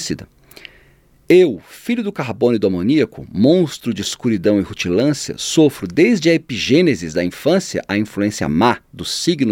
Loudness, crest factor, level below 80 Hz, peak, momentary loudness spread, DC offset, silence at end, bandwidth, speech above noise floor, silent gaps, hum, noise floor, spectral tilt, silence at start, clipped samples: -17 LUFS; 16 dB; -50 dBFS; -2 dBFS; 8 LU; under 0.1%; 0 s; 16.5 kHz; 35 dB; none; none; -51 dBFS; -5 dB/octave; 0 s; under 0.1%